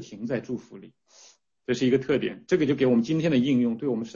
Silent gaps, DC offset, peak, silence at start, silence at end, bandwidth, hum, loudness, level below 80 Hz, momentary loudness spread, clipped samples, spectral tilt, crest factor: none; under 0.1%; -10 dBFS; 0 s; 0.05 s; 7.4 kHz; none; -25 LUFS; -62 dBFS; 9 LU; under 0.1%; -7 dB/octave; 16 dB